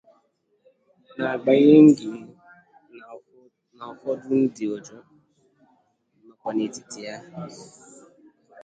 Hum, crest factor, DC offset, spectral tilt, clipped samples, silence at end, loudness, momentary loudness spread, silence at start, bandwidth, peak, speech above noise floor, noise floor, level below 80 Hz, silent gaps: none; 22 dB; under 0.1%; -6.5 dB/octave; under 0.1%; 1.15 s; -20 LUFS; 28 LU; 1.2 s; 8.8 kHz; -2 dBFS; 47 dB; -67 dBFS; -70 dBFS; none